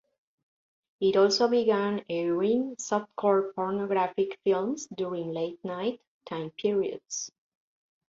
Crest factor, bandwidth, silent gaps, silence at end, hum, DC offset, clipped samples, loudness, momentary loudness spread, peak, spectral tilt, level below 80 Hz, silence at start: 18 dB; 7.8 kHz; 6.07-6.20 s; 0.8 s; none; under 0.1%; under 0.1%; -28 LUFS; 12 LU; -10 dBFS; -4.5 dB/octave; -74 dBFS; 1 s